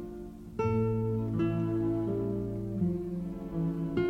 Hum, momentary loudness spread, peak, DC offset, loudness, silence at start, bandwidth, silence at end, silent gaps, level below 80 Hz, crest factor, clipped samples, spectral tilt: none; 7 LU; -18 dBFS; under 0.1%; -32 LUFS; 0 s; 6.2 kHz; 0 s; none; -50 dBFS; 14 dB; under 0.1%; -10 dB/octave